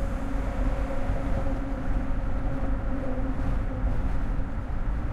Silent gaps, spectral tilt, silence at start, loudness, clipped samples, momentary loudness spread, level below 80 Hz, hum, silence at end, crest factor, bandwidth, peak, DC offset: none; -8.5 dB/octave; 0 s; -31 LUFS; under 0.1%; 2 LU; -28 dBFS; none; 0 s; 12 dB; 7.6 kHz; -14 dBFS; under 0.1%